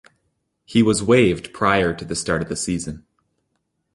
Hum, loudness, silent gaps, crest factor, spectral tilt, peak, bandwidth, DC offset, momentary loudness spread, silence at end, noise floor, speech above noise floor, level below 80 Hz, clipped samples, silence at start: none; -20 LUFS; none; 20 dB; -5 dB/octave; -2 dBFS; 11.5 kHz; under 0.1%; 11 LU; 0.95 s; -73 dBFS; 54 dB; -46 dBFS; under 0.1%; 0.7 s